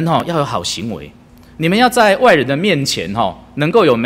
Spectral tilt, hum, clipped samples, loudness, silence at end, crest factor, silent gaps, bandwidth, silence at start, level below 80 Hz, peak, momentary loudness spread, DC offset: -5 dB/octave; none; under 0.1%; -14 LUFS; 0 s; 14 dB; none; 16 kHz; 0 s; -46 dBFS; 0 dBFS; 10 LU; under 0.1%